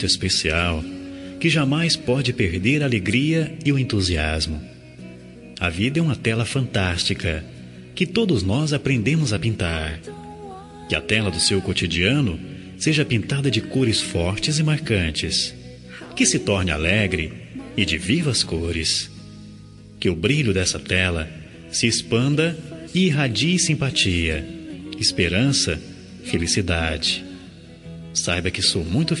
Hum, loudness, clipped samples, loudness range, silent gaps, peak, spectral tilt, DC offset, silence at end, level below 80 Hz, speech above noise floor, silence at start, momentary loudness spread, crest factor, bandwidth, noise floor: none; -21 LUFS; under 0.1%; 3 LU; none; -4 dBFS; -4 dB/octave; under 0.1%; 0 s; -42 dBFS; 21 dB; 0 s; 17 LU; 18 dB; 11.5 kHz; -42 dBFS